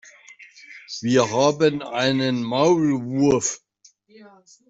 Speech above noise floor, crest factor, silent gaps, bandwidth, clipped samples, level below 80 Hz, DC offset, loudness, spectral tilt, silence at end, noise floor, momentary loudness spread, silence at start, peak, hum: 36 dB; 18 dB; none; 8 kHz; under 0.1%; -60 dBFS; under 0.1%; -20 LUFS; -4.5 dB/octave; 1.15 s; -56 dBFS; 16 LU; 0.4 s; -4 dBFS; none